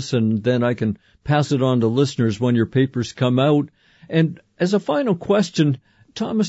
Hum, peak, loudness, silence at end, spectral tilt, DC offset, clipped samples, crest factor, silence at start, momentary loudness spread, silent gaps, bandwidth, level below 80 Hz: none; -6 dBFS; -20 LUFS; 0 s; -7 dB/octave; under 0.1%; under 0.1%; 14 dB; 0 s; 7 LU; none; 8 kHz; -56 dBFS